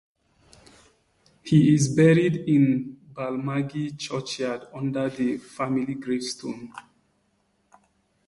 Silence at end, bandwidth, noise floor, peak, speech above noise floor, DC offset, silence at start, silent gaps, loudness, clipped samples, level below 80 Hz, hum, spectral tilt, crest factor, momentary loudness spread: 1.45 s; 11.5 kHz; -69 dBFS; -6 dBFS; 46 dB; under 0.1%; 1.45 s; none; -24 LUFS; under 0.1%; -62 dBFS; none; -6.5 dB/octave; 18 dB; 16 LU